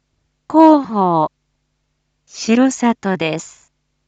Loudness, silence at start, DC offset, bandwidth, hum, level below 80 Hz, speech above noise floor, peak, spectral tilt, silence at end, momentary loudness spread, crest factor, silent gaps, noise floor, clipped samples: -15 LUFS; 0.5 s; under 0.1%; 8.8 kHz; none; -64 dBFS; 52 dB; 0 dBFS; -5.5 dB/octave; 0.6 s; 13 LU; 16 dB; none; -68 dBFS; under 0.1%